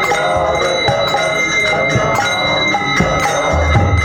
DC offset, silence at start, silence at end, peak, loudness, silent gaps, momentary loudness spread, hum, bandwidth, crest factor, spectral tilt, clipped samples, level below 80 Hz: under 0.1%; 0 s; 0 s; 0 dBFS; -13 LUFS; none; 2 LU; none; over 20 kHz; 14 dB; -4 dB/octave; under 0.1%; -28 dBFS